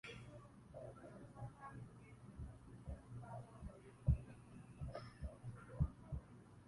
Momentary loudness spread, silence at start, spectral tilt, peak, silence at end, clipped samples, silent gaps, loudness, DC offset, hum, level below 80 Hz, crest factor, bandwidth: 16 LU; 0.05 s; -8 dB/octave; -24 dBFS; 0 s; under 0.1%; none; -50 LUFS; under 0.1%; none; -54 dBFS; 24 dB; 11.5 kHz